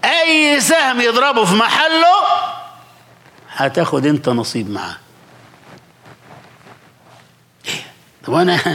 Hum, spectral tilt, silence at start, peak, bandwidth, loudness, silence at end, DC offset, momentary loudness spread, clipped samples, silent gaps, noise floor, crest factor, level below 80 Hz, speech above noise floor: none; -3.5 dB/octave; 0.05 s; -2 dBFS; 17 kHz; -14 LUFS; 0 s; under 0.1%; 17 LU; under 0.1%; none; -48 dBFS; 14 dB; -66 dBFS; 34 dB